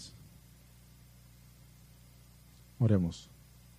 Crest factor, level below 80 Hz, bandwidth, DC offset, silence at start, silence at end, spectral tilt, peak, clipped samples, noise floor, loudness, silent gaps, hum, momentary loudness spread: 22 dB; -60 dBFS; 15.5 kHz; under 0.1%; 0 s; 0.55 s; -8 dB/octave; -16 dBFS; under 0.1%; -58 dBFS; -31 LUFS; none; 60 Hz at -55 dBFS; 29 LU